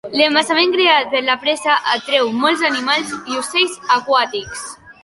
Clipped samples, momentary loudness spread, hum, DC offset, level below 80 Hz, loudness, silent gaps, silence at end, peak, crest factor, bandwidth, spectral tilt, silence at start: under 0.1%; 10 LU; none; under 0.1%; -58 dBFS; -15 LUFS; none; 0.1 s; 0 dBFS; 16 dB; 11.5 kHz; -1.5 dB/octave; 0.05 s